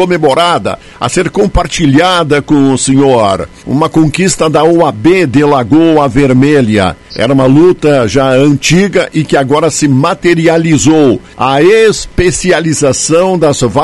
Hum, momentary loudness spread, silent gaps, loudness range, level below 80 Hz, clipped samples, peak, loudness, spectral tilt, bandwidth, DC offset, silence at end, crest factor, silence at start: none; 5 LU; none; 1 LU; -30 dBFS; 2%; 0 dBFS; -8 LUFS; -5 dB/octave; 12 kHz; 0.6%; 0 s; 8 dB; 0 s